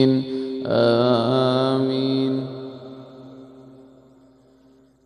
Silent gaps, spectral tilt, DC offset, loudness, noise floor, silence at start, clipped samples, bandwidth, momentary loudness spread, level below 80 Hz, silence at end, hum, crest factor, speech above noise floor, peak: none; -8 dB/octave; under 0.1%; -21 LUFS; -55 dBFS; 0 s; under 0.1%; 10 kHz; 23 LU; -64 dBFS; 1.35 s; none; 18 dB; 36 dB; -4 dBFS